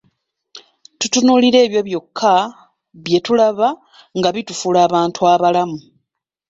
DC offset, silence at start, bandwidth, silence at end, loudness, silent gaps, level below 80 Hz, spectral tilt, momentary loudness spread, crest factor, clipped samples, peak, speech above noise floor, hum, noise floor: under 0.1%; 0.55 s; 8 kHz; 0.7 s; -15 LUFS; none; -60 dBFS; -4 dB/octave; 13 LU; 14 dB; under 0.1%; -2 dBFS; 61 dB; none; -76 dBFS